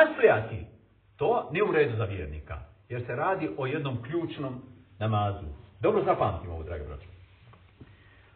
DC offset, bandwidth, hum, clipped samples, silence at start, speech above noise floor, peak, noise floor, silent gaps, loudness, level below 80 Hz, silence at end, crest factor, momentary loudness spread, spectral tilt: under 0.1%; 4.4 kHz; none; under 0.1%; 0 s; 27 dB; -8 dBFS; -55 dBFS; none; -29 LUFS; -50 dBFS; 0.45 s; 22 dB; 17 LU; -5.5 dB/octave